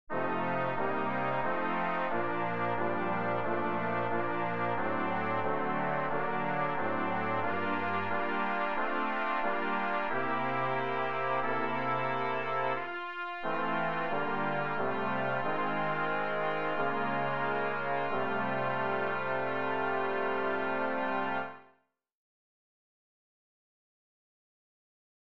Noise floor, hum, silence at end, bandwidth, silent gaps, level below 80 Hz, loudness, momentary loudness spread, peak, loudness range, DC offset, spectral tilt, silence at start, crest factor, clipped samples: -70 dBFS; none; 3.15 s; 7 kHz; none; -68 dBFS; -32 LUFS; 1 LU; -18 dBFS; 2 LU; 1%; -8 dB/octave; 0.05 s; 16 dB; under 0.1%